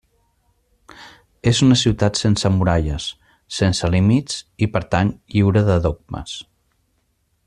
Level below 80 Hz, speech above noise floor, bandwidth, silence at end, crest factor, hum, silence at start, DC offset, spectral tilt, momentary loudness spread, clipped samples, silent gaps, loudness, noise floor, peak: -38 dBFS; 49 dB; 11 kHz; 1.05 s; 16 dB; none; 1 s; under 0.1%; -5.5 dB/octave; 15 LU; under 0.1%; none; -18 LUFS; -66 dBFS; -2 dBFS